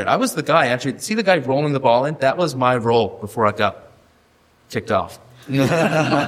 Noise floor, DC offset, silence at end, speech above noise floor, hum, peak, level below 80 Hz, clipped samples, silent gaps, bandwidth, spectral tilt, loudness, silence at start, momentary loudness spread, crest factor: -56 dBFS; under 0.1%; 0 s; 38 dB; none; 0 dBFS; -56 dBFS; under 0.1%; none; 16 kHz; -5.5 dB/octave; -19 LUFS; 0 s; 6 LU; 18 dB